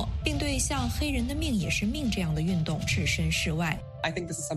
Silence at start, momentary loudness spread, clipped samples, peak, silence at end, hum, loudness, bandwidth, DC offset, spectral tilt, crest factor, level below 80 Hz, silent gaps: 0 s; 5 LU; under 0.1%; -12 dBFS; 0 s; none; -28 LUFS; 14 kHz; under 0.1%; -4.5 dB/octave; 18 dB; -36 dBFS; none